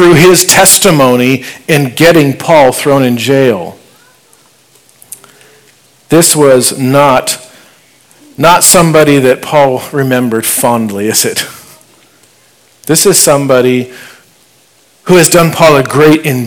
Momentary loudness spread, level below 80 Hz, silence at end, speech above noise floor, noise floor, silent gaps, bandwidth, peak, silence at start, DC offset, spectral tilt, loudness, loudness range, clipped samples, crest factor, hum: 10 LU; -42 dBFS; 0 s; 40 dB; -46 dBFS; none; over 20 kHz; 0 dBFS; 0 s; under 0.1%; -4 dB/octave; -7 LUFS; 5 LU; 7%; 8 dB; none